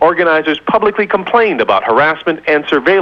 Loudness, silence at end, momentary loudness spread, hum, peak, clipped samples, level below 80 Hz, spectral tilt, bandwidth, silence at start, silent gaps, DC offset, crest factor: -12 LUFS; 0 s; 3 LU; none; 0 dBFS; under 0.1%; -50 dBFS; -6.5 dB/octave; 7 kHz; 0 s; none; under 0.1%; 12 dB